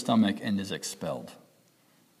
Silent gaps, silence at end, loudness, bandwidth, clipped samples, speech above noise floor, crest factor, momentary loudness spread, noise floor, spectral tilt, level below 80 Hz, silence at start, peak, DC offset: none; 0.85 s; -30 LUFS; 14.5 kHz; under 0.1%; 35 dB; 18 dB; 14 LU; -64 dBFS; -5 dB/octave; -72 dBFS; 0 s; -12 dBFS; under 0.1%